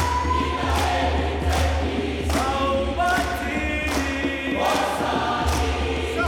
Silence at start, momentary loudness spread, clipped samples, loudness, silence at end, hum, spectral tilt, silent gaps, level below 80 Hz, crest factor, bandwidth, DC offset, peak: 0 s; 3 LU; under 0.1%; -23 LUFS; 0 s; none; -5 dB/octave; none; -30 dBFS; 14 dB; 17 kHz; under 0.1%; -8 dBFS